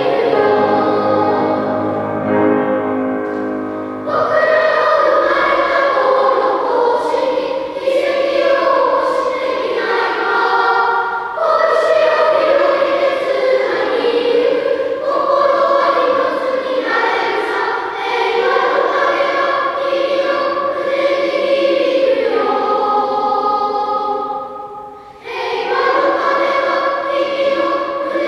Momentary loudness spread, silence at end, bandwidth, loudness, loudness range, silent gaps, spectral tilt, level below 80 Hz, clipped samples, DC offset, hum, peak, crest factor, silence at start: 6 LU; 0 s; 11 kHz; -15 LUFS; 3 LU; none; -5 dB/octave; -56 dBFS; under 0.1%; under 0.1%; none; 0 dBFS; 14 dB; 0 s